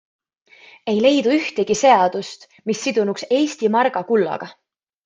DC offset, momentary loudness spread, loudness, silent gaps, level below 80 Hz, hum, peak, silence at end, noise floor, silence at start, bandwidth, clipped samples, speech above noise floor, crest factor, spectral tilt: under 0.1%; 16 LU; -18 LUFS; none; -66 dBFS; none; -2 dBFS; 0.55 s; -50 dBFS; 0.85 s; 9.6 kHz; under 0.1%; 32 dB; 18 dB; -4 dB/octave